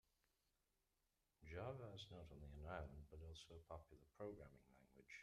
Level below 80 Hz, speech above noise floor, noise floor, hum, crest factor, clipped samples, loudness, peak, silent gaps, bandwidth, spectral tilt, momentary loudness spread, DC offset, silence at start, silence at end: -68 dBFS; 31 dB; -89 dBFS; none; 22 dB; under 0.1%; -58 LUFS; -36 dBFS; none; 13 kHz; -6 dB/octave; 8 LU; under 0.1%; 1.4 s; 0 s